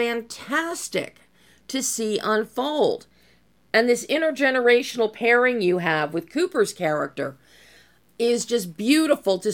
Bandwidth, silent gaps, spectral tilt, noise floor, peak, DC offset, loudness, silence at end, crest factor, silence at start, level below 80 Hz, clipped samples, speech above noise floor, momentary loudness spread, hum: 17.5 kHz; none; -3.5 dB/octave; -60 dBFS; -4 dBFS; under 0.1%; -22 LUFS; 0 s; 18 dB; 0 s; -68 dBFS; under 0.1%; 38 dB; 10 LU; none